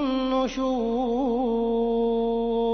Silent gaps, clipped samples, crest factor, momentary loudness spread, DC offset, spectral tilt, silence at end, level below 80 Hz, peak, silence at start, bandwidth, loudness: none; under 0.1%; 12 dB; 2 LU; under 0.1%; -6 dB/octave; 0 s; -46 dBFS; -12 dBFS; 0 s; 6.6 kHz; -25 LUFS